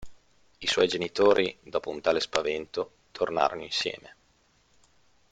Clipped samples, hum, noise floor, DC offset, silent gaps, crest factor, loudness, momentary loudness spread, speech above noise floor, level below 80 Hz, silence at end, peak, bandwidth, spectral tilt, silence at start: under 0.1%; none; -66 dBFS; under 0.1%; none; 28 dB; -27 LUFS; 11 LU; 39 dB; -62 dBFS; 1.2 s; -2 dBFS; 9.4 kHz; -3 dB/octave; 0 s